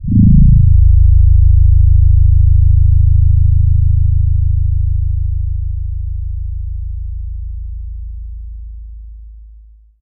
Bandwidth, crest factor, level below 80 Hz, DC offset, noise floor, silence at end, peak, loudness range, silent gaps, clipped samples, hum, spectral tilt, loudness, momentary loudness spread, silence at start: 0.4 kHz; 10 dB; -12 dBFS; under 0.1%; -40 dBFS; 0 s; -2 dBFS; 16 LU; none; under 0.1%; none; -18.5 dB/octave; -12 LUFS; 19 LU; 0 s